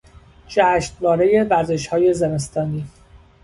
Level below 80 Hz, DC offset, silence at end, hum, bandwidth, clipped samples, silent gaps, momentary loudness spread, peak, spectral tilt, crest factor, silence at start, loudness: -46 dBFS; under 0.1%; 0.25 s; none; 11.5 kHz; under 0.1%; none; 9 LU; -4 dBFS; -6 dB/octave; 16 dB; 0.15 s; -18 LUFS